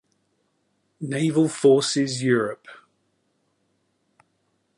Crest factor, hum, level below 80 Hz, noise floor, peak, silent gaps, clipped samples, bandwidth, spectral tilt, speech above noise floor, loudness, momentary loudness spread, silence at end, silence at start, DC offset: 20 dB; none; -74 dBFS; -71 dBFS; -6 dBFS; none; under 0.1%; 11.5 kHz; -5 dB/octave; 50 dB; -21 LUFS; 14 LU; 2.05 s; 1 s; under 0.1%